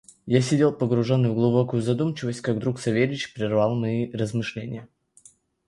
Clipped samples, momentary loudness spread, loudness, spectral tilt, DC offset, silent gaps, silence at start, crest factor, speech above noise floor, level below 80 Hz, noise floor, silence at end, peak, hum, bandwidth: under 0.1%; 8 LU; -24 LUFS; -7 dB/octave; under 0.1%; none; 0.25 s; 20 dB; 33 dB; -60 dBFS; -56 dBFS; 0.85 s; -4 dBFS; none; 11.5 kHz